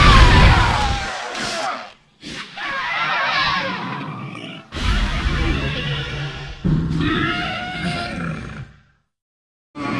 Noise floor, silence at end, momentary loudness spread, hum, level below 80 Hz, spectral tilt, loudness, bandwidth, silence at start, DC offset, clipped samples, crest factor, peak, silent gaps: -55 dBFS; 0 s; 17 LU; none; -24 dBFS; -5 dB/octave; -20 LUFS; 12 kHz; 0 s; under 0.1%; under 0.1%; 20 dB; 0 dBFS; 9.22-9.74 s